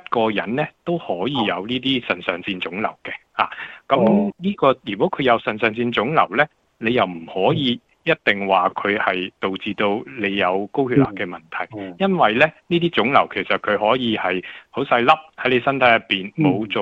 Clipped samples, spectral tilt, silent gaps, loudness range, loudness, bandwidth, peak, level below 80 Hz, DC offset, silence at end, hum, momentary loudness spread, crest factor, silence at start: under 0.1%; -7.5 dB/octave; none; 3 LU; -20 LUFS; 7.6 kHz; -2 dBFS; -58 dBFS; under 0.1%; 0 s; none; 9 LU; 18 dB; 0.1 s